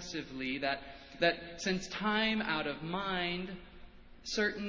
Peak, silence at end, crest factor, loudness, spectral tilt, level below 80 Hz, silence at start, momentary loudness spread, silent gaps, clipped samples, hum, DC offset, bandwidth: -14 dBFS; 0 s; 22 dB; -34 LUFS; -4 dB/octave; -58 dBFS; 0 s; 10 LU; none; under 0.1%; none; under 0.1%; 7.8 kHz